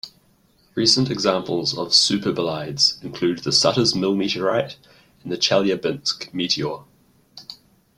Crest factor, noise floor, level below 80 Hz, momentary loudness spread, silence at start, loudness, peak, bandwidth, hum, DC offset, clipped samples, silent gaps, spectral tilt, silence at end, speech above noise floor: 20 dB; -59 dBFS; -58 dBFS; 18 LU; 0.05 s; -20 LUFS; -2 dBFS; 16 kHz; none; under 0.1%; under 0.1%; none; -3.5 dB/octave; 0.45 s; 38 dB